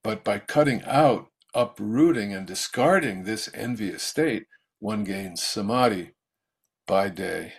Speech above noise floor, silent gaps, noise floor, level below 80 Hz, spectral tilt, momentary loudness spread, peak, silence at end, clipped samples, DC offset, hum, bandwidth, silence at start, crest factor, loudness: 59 dB; none; -83 dBFS; -62 dBFS; -5 dB/octave; 10 LU; -6 dBFS; 0 s; under 0.1%; under 0.1%; none; 14.5 kHz; 0.05 s; 20 dB; -25 LUFS